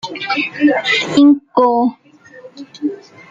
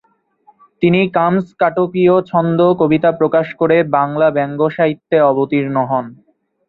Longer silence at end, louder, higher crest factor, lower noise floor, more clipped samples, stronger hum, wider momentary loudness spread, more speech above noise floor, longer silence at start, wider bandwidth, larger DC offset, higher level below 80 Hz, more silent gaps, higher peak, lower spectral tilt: second, 0.3 s vs 0.55 s; about the same, -14 LUFS vs -14 LUFS; about the same, 14 dB vs 14 dB; second, -40 dBFS vs -53 dBFS; neither; neither; first, 14 LU vs 5 LU; second, 27 dB vs 39 dB; second, 0.05 s vs 0.8 s; first, 7.6 kHz vs 4.6 kHz; neither; second, -62 dBFS vs -56 dBFS; neither; about the same, -2 dBFS vs 0 dBFS; second, -4.5 dB/octave vs -10 dB/octave